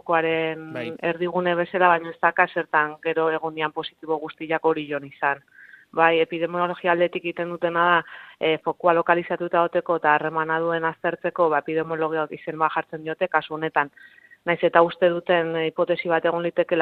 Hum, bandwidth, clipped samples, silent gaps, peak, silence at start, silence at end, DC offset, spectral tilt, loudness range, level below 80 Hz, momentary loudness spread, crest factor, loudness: none; 4.5 kHz; under 0.1%; none; -2 dBFS; 0.05 s; 0 s; under 0.1%; -8 dB/octave; 3 LU; -68 dBFS; 9 LU; 22 dB; -23 LUFS